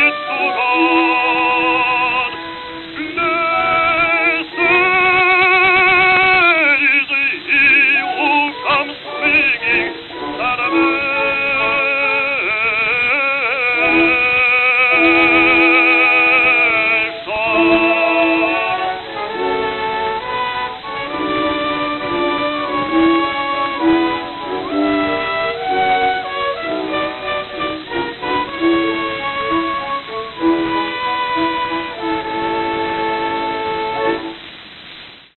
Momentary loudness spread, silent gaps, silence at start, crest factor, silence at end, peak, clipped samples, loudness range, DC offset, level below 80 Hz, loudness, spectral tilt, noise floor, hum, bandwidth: 12 LU; none; 0 s; 14 dB; 0.2 s; -2 dBFS; under 0.1%; 9 LU; under 0.1%; -48 dBFS; -14 LUFS; -7 dB/octave; -37 dBFS; none; 4.4 kHz